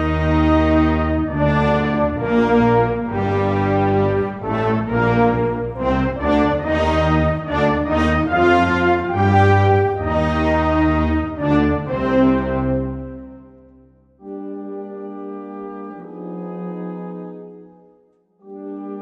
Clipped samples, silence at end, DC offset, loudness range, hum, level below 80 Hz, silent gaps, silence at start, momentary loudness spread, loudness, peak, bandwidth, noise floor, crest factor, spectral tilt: under 0.1%; 0 s; under 0.1%; 16 LU; none; -32 dBFS; none; 0 s; 16 LU; -18 LUFS; -2 dBFS; 8.2 kHz; -57 dBFS; 16 dB; -8.5 dB/octave